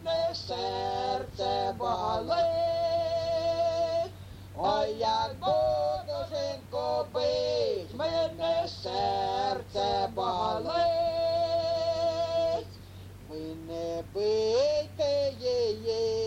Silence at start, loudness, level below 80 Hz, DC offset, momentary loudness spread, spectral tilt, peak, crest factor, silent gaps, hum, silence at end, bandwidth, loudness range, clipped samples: 0 s; -30 LUFS; -56 dBFS; under 0.1%; 8 LU; -5 dB/octave; -16 dBFS; 14 dB; none; none; 0 s; 15 kHz; 2 LU; under 0.1%